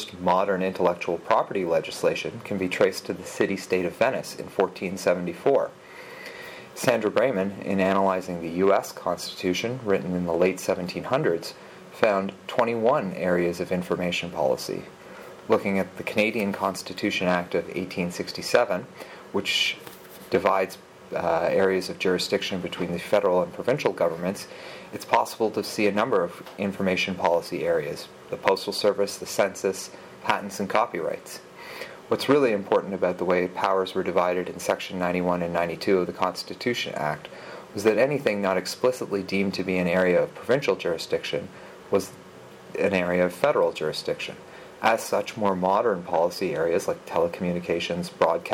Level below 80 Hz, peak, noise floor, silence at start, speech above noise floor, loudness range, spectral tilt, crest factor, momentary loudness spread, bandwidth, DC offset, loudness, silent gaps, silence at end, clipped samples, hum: -64 dBFS; 0 dBFS; -45 dBFS; 0 s; 20 dB; 2 LU; -5 dB/octave; 24 dB; 13 LU; 17 kHz; under 0.1%; -25 LUFS; none; 0 s; under 0.1%; none